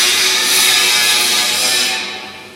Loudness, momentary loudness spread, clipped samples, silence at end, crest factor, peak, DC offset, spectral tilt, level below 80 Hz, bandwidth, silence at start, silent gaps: -11 LUFS; 10 LU; under 0.1%; 0 s; 14 dB; 0 dBFS; under 0.1%; 1.5 dB/octave; -62 dBFS; 16 kHz; 0 s; none